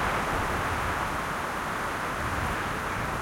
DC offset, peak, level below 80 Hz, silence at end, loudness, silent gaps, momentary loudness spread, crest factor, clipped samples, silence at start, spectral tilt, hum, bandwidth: under 0.1%; -16 dBFS; -42 dBFS; 0 s; -29 LUFS; none; 3 LU; 14 dB; under 0.1%; 0 s; -4.5 dB/octave; none; 16.5 kHz